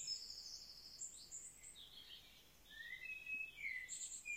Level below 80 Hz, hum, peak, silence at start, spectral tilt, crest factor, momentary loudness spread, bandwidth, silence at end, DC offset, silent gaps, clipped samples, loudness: -76 dBFS; none; -36 dBFS; 0 s; 1.5 dB/octave; 16 dB; 12 LU; 16.5 kHz; 0 s; under 0.1%; none; under 0.1%; -49 LUFS